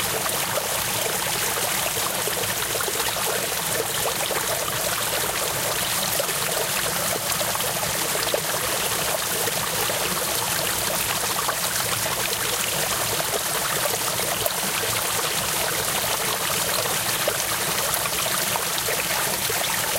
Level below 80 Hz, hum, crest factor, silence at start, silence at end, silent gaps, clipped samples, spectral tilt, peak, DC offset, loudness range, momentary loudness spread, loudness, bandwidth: -50 dBFS; none; 20 dB; 0 s; 0 s; none; under 0.1%; -1 dB/octave; -4 dBFS; under 0.1%; 1 LU; 1 LU; -22 LUFS; 17 kHz